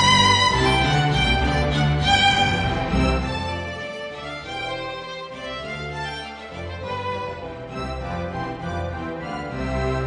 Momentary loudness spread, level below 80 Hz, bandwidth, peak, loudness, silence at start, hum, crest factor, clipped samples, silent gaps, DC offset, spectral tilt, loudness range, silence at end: 16 LU; -34 dBFS; 10 kHz; -4 dBFS; -22 LUFS; 0 s; none; 18 dB; under 0.1%; none; under 0.1%; -4.5 dB/octave; 11 LU; 0 s